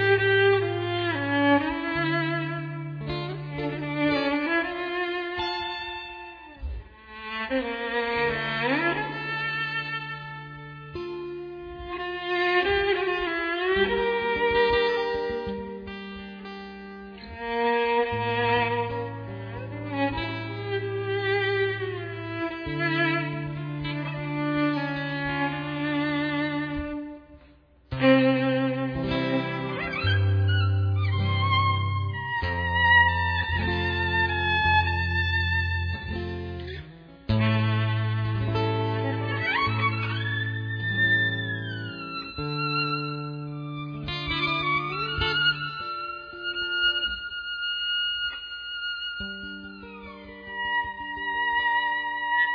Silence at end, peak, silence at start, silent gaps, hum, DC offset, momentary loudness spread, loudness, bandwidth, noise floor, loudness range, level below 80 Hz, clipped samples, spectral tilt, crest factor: 0 s; -8 dBFS; 0 s; none; none; under 0.1%; 14 LU; -26 LUFS; 5.4 kHz; -55 dBFS; 7 LU; -46 dBFS; under 0.1%; -7.5 dB/octave; 20 dB